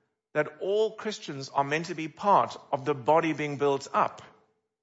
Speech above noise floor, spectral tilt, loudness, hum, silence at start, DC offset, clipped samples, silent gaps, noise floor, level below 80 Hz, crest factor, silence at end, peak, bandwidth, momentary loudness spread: 39 dB; -5 dB/octave; -28 LUFS; none; 0.35 s; under 0.1%; under 0.1%; none; -67 dBFS; -76 dBFS; 20 dB; 0.55 s; -10 dBFS; 8 kHz; 9 LU